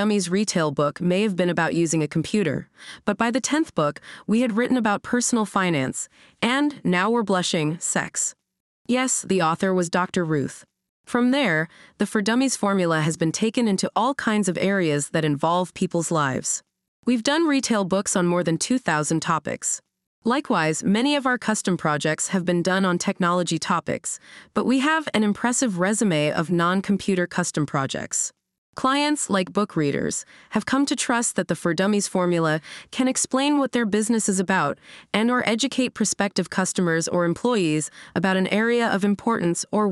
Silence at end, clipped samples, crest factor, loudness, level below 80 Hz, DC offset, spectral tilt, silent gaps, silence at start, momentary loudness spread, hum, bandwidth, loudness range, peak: 0 s; under 0.1%; 18 dB; -22 LUFS; -64 dBFS; under 0.1%; -4.5 dB/octave; 8.60-8.85 s, 10.89-11.04 s, 16.88-17.03 s, 20.07-20.22 s, 28.58-28.73 s; 0 s; 6 LU; none; 13 kHz; 1 LU; -4 dBFS